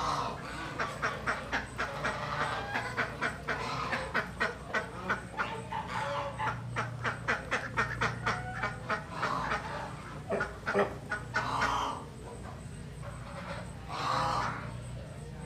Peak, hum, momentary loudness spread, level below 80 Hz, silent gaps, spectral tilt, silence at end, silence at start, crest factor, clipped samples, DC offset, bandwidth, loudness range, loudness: -16 dBFS; none; 11 LU; -52 dBFS; none; -4.5 dB/octave; 0 s; 0 s; 20 dB; under 0.1%; under 0.1%; 15.5 kHz; 2 LU; -35 LUFS